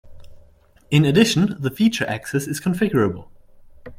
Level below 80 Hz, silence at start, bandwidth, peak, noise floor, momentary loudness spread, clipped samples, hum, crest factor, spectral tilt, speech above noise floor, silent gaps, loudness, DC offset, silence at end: -50 dBFS; 0.05 s; 16 kHz; -2 dBFS; -52 dBFS; 9 LU; under 0.1%; none; 20 dB; -5.5 dB/octave; 33 dB; none; -20 LUFS; under 0.1%; 0.05 s